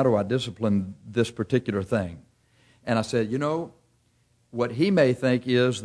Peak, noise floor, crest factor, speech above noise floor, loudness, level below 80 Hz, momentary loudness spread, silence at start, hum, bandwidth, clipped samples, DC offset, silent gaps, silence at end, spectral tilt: -8 dBFS; -65 dBFS; 18 dB; 41 dB; -25 LUFS; -60 dBFS; 10 LU; 0 s; none; 11 kHz; under 0.1%; under 0.1%; none; 0 s; -6.5 dB/octave